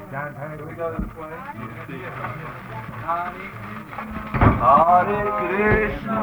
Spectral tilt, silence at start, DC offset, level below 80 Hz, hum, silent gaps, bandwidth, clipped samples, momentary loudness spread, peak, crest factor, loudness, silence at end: -8.5 dB/octave; 0 s; under 0.1%; -36 dBFS; none; none; over 20 kHz; under 0.1%; 19 LU; 0 dBFS; 22 dB; -21 LUFS; 0 s